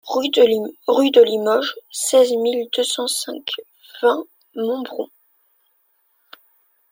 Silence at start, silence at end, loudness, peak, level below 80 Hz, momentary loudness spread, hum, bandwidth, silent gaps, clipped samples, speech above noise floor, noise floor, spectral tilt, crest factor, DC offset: 0.05 s; 1.85 s; -18 LUFS; -2 dBFS; -72 dBFS; 14 LU; none; 16.5 kHz; none; under 0.1%; 46 dB; -64 dBFS; -2 dB/octave; 18 dB; under 0.1%